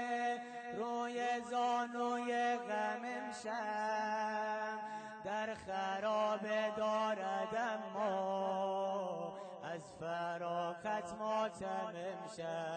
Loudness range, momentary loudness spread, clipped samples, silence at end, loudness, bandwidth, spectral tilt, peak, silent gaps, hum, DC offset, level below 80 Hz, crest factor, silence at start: 3 LU; 8 LU; under 0.1%; 0 s; -39 LUFS; 9.2 kHz; -4.5 dB/octave; -26 dBFS; none; none; under 0.1%; -78 dBFS; 12 dB; 0 s